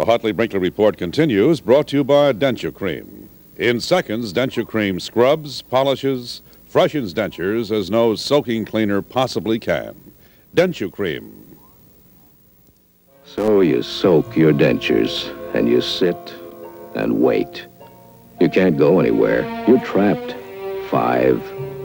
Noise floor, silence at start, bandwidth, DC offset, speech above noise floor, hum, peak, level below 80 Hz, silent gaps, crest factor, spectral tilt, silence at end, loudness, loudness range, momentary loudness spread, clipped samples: -54 dBFS; 0 s; 18 kHz; under 0.1%; 37 dB; none; -2 dBFS; -50 dBFS; none; 18 dB; -6 dB/octave; 0 s; -18 LUFS; 6 LU; 14 LU; under 0.1%